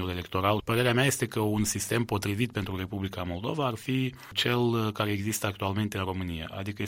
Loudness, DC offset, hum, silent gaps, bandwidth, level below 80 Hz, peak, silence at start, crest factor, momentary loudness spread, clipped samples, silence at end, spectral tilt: -29 LUFS; under 0.1%; none; none; 16.5 kHz; -54 dBFS; -10 dBFS; 0 s; 20 dB; 8 LU; under 0.1%; 0 s; -4.5 dB/octave